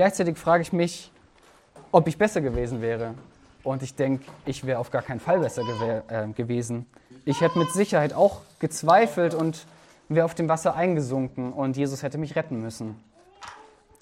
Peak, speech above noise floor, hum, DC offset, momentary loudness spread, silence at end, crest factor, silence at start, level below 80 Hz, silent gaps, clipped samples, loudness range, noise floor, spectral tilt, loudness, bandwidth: -4 dBFS; 32 dB; none; under 0.1%; 13 LU; 0.4 s; 22 dB; 0 s; -52 dBFS; none; under 0.1%; 5 LU; -56 dBFS; -6 dB/octave; -25 LUFS; 16 kHz